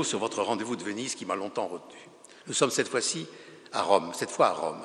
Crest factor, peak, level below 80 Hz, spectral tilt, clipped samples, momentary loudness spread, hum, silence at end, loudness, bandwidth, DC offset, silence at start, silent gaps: 24 dB; -6 dBFS; -78 dBFS; -3 dB/octave; under 0.1%; 17 LU; none; 0 s; -29 LUFS; 13 kHz; under 0.1%; 0 s; none